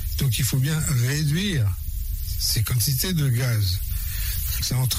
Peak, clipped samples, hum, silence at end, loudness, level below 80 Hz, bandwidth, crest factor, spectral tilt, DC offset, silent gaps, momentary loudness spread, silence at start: -10 dBFS; under 0.1%; none; 0 s; -23 LUFS; -32 dBFS; 16 kHz; 12 dB; -4 dB/octave; under 0.1%; none; 6 LU; 0 s